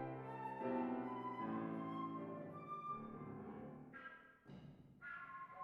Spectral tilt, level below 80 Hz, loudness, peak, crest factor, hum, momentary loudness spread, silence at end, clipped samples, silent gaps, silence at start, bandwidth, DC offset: -9 dB/octave; -80 dBFS; -48 LUFS; -32 dBFS; 16 dB; none; 15 LU; 0 s; under 0.1%; none; 0 s; 5.6 kHz; under 0.1%